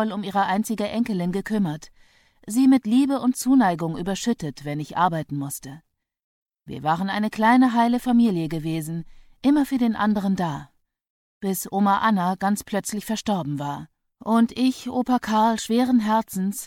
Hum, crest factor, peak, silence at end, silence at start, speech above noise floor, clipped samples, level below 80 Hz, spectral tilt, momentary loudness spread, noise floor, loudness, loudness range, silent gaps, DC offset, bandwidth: none; 16 dB; -6 dBFS; 0 s; 0 s; 34 dB; under 0.1%; -54 dBFS; -5.5 dB/octave; 11 LU; -56 dBFS; -22 LUFS; 4 LU; 6.24-6.46 s, 11.10-11.41 s; under 0.1%; 17 kHz